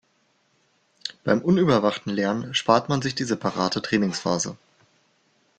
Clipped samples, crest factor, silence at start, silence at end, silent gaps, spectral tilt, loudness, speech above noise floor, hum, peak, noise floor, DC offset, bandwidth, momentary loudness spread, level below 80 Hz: under 0.1%; 22 dB; 1.05 s; 1.05 s; none; -5 dB/octave; -23 LUFS; 44 dB; none; -2 dBFS; -67 dBFS; under 0.1%; 9.2 kHz; 8 LU; -60 dBFS